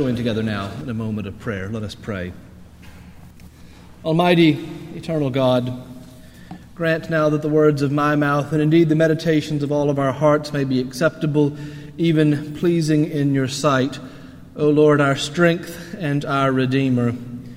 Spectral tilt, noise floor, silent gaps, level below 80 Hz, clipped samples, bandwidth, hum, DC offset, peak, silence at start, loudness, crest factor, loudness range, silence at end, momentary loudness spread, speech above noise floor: -6.5 dB/octave; -42 dBFS; none; -50 dBFS; under 0.1%; 16 kHz; none; under 0.1%; 0 dBFS; 0 s; -19 LUFS; 18 dB; 5 LU; 0 s; 14 LU; 24 dB